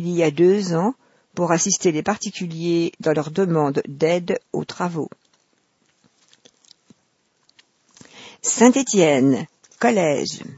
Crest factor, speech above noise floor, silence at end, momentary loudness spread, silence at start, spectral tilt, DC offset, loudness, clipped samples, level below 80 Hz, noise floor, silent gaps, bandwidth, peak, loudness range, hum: 22 dB; 47 dB; 0.05 s; 11 LU; 0 s; -4.5 dB/octave; under 0.1%; -20 LUFS; under 0.1%; -66 dBFS; -66 dBFS; none; 8 kHz; 0 dBFS; 13 LU; none